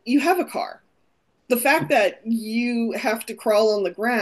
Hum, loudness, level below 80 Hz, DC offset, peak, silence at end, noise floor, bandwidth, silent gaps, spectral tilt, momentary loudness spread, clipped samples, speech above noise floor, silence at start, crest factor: none; -21 LUFS; -72 dBFS; under 0.1%; -6 dBFS; 0 s; -68 dBFS; 13 kHz; none; -4 dB/octave; 8 LU; under 0.1%; 47 dB; 0.05 s; 16 dB